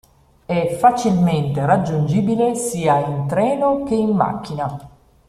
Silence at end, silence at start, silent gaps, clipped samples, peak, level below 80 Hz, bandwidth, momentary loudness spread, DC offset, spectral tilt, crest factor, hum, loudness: 0.4 s; 0.5 s; none; under 0.1%; -2 dBFS; -50 dBFS; 14 kHz; 9 LU; under 0.1%; -7 dB/octave; 16 dB; none; -18 LUFS